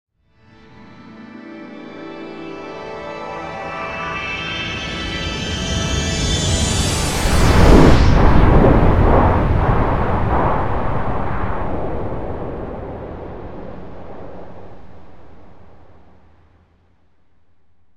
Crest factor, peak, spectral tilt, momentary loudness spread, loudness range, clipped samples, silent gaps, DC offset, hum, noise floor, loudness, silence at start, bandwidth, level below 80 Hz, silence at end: 18 dB; 0 dBFS; -5.5 dB/octave; 22 LU; 20 LU; under 0.1%; none; under 0.1%; none; -62 dBFS; -17 LUFS; 0.7 s; 15 kHz; -22 dBFS; 1.75 s